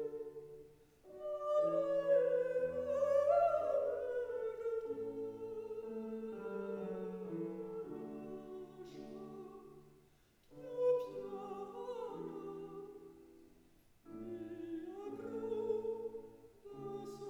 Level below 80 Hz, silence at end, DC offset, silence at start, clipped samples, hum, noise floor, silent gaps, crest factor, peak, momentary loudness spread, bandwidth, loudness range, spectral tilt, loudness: -74 dBFS; 0 s; under 0.1%; 0 s; under 0.1%; none; -69 dBFS; none; 18 dB; -22 dBFS; 19 LU; 11 kHz; 14 LU; -7 dB/octave; -40 LUFS